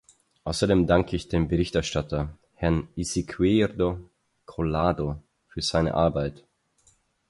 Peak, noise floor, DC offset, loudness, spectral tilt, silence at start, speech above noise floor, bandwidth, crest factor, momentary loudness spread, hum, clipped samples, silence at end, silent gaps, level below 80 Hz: -6 dBFS; -64 dBFS; under 0.1%; -26 LUFS; -6 dB/octave; 0.45 s; 40 dB; 11.5 kHz; 20 dB; 12 LU; none; under 0.1%; 0.95 s; none; -40 dBFS